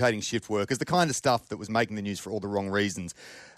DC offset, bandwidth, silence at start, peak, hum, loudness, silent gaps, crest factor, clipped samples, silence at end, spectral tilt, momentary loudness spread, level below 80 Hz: under 0.1%; 14 kHz; 0 s; -12 dBFS; none; -28 LUFS; none; 16 dB; under 0.1%; 0.1 s; -4.5 dB/octave; 9 LU; -64 dBFS